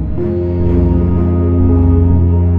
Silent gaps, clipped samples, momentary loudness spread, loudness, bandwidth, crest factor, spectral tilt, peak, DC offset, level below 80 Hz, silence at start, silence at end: none; under 0.1%; 5 LU; -13 LUFS; 2.9 kHz; 10 dB; -13 dB/octave; 0 dBFS; 3%; -22 dBFS; 0 s; 0 s